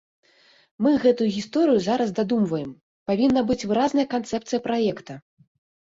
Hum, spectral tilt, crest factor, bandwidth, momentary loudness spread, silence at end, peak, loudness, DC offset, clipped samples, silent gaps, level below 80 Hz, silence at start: none; -6 dB/octave; 16 dB; 7.8 kHz; 13 LU; 0.65 s; -8 dBFS; -23 LUFS; under 0.1%; under 0.1%; 2.81-3.06 s; -58 dBFS; 0.8 s